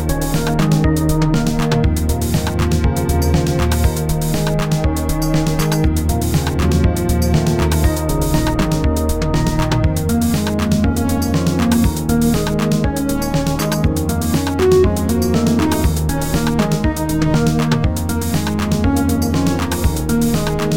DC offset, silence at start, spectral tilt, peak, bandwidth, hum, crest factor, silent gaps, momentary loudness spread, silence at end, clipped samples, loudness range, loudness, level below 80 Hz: 2%; 0 s; -6 dB/octave; -2 dBFS; 17 kHz; none; 14 dB; none; 3 LU; 0 s; under 0.1%; 1 LU; -17 LUFS; -22 dBFS